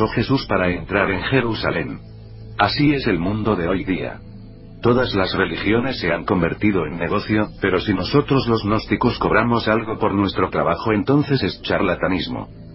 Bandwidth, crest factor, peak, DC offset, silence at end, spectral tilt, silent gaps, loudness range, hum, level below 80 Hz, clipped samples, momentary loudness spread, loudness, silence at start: 5.8 kHz; 20 dB; 0 dBFS; under 0.1%; 0 s; -10 dB/octave; none; 2 LU; none; -38 dBFS; under 0.1%; 7 LU; -19 LUFS; 0 s